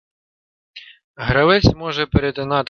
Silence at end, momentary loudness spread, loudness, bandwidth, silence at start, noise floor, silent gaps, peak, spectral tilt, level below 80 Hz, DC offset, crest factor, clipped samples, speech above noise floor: 0.05 s; 8 LU; -17 LUFS; 6.8 kHz; 0.75 s; under -90 dBFS; 1.04-1.14 s; 0 dBFS; -6.5 dB/octave; -34 dBFS; under 0.1%; 18 dB; under 0.1%; over 73 dB